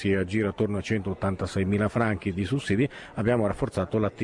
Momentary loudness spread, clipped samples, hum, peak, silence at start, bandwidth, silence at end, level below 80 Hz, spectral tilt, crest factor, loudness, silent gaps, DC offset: 4 LU; under 0.1%; none; -12 dBFS; 0 s; 10.5 kHz; 0 s; -50 dBFS; -7 dB/octave; 14 dB; -27 LUFS; none; under 0.1%